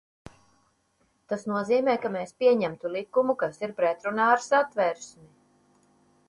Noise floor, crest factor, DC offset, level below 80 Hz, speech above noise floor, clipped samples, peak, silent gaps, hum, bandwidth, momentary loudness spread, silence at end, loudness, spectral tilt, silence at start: -70 dBFS; 20 dB; under 0.1%; -70 dBFS; 44 dB; under 0.1%; -8 dBFS; none; none; 11 kHz; 11 LU; 1.2 s; -26 LUFS; -5 dB/octave; 1.3 s